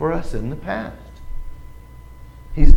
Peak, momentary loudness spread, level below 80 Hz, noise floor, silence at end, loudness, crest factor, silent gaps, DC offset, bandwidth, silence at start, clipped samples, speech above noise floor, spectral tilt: 0 dBFS; 19 LU; -20 dBFS; -39 dBFS; 0 s; -28 LUFS; 16 dB; none; under 0.1%; 5.2 kHz; 0 s; 0.3%; 16 dB; -8 dB/octave